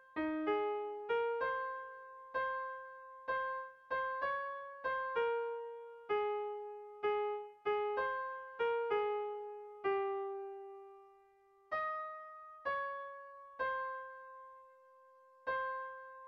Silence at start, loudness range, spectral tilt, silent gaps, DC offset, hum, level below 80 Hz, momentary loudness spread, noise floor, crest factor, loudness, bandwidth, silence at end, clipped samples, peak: 0 s; 5 LU; -6 dB/octave; none; under 0.1%; none; -76 dBFS; 15 LU; -68 dBFS; 16 dB; -39 LUFS; 5.6 kHz; 0 s; under 0.1%; -24 dBFS